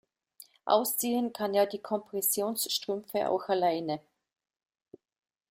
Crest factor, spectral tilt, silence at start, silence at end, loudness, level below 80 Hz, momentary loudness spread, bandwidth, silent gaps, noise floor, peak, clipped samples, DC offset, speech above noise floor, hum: 20 dB; -3 dB/octave; 0.65 s; 1.5 s; -30 LUFS; -78 dBFS; 7 LU; 16 kHz; none; -57 dBFS; -10 dBFS; under 0.1%; under 0.1%; 28 dB; none